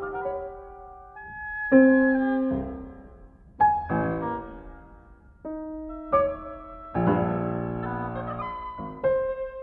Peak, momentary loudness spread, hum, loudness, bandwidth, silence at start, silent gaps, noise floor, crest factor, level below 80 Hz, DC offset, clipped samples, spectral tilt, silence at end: -6 dBFS; 21 LU; none; -26 LUFS; 4 kHz; 0 s; none; -51 dBFS; 20 dB; -48 dBFS; under 0.1%; under 0.1%; -11.5 dB/octave; 0 s